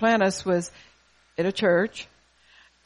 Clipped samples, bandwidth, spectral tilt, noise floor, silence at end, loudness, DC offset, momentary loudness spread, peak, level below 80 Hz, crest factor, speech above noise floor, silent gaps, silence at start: under 0.1%; 11.5 kHz; -5 dB/octave; -58 dBFS; 0.8 s; -24 LUFS; under 0.1%; 18 LU; -10 dBFS; -62 dBFS; 16 dB; 34 dB; none; 0 s